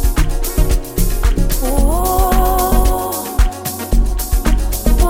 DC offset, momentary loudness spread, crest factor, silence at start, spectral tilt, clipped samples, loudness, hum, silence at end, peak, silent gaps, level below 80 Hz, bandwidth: under 0.1%; 5 LU; 12 dB; 0 s; -5 dB/octave; under 0.1%; -17 LUFS; none; 0 s; 0 dBFS; none; -14 dBFS; 17 kHz